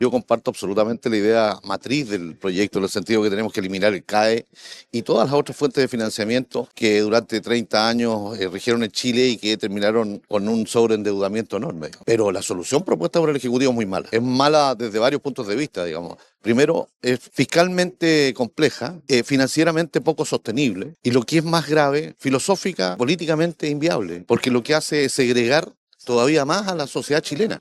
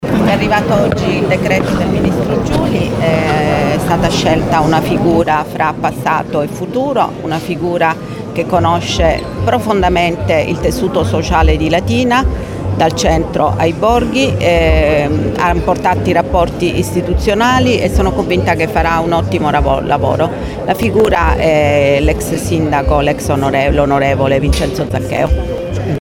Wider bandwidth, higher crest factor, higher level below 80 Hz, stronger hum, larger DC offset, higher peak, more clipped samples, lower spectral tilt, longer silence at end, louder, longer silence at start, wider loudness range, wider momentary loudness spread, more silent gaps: second, 14 kHz vs 17 kHz; first, 20 dB vs 12 dB; second, -62 dBFS vs -22 dBFS; neither; neither; about the same, -2 dBFS vs 0 dBFS; neither; second, -4.5 dB/octave vs -6 dB/octave; about the same, 0 s vs 0 s; second, -20 LUFS vs -13 LUFS; about the same, 0 s vs 0 s; about the same, 2 LU vs 2 LU; first, 8 LU vs 5 LU; first, 25.77-25.87 s vs none